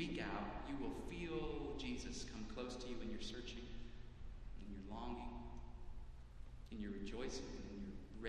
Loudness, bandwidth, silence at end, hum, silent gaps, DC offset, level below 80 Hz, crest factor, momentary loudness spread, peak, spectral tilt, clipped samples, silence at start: -50 LUFS; 11 kHz; 0 s; none; none; under 0.1%; -54 dBFS; 16 dB; 13 LU; -30 dBFS; -5 dB/octave; under 0.1%; 0 s